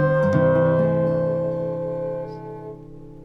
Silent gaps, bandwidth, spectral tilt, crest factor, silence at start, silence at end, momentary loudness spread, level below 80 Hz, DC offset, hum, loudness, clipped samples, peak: none; 6.2 kHz; -10 dB/octave; 16 dB; 0 s; 0 s; 19 LU; -52 dBFS; under 0.1%; none; -21 LUFS; under 0.1%; -6 dBFS